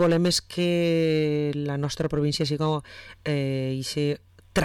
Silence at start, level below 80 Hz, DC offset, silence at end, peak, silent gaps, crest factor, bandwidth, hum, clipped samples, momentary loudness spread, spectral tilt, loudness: 0 s; -50 dBFS; under 0.1%; 0 s; -14 dBFS; none; 10 dB; 16.5 kHz; none; under 0.1%; 7 LU; -5.5 dB/octave; -26 LUFS